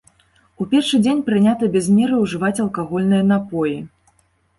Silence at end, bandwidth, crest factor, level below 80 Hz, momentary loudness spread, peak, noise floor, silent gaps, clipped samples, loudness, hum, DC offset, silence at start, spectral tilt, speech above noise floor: 0.7 s; 11.5 kHz; 14 dB; -56 dBFS; 7 LU; -6 dBFS; -60 dBFS; none; under 0.1%; -18 LUFS; none; under 0.1%; 0.6 s; -6 dB/octave; 43 dB